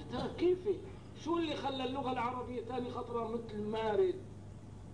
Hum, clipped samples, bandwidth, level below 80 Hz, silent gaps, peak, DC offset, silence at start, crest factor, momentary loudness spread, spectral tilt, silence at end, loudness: 50 Hz at -55 dBFS; under 0.1%; 10.5 kHz; -58 dBFS; none; -22 dBFS; 0.1%; 0 s; 16 dB; 15 LU; -6.5 dB/octave; 0 s; -37 LUFS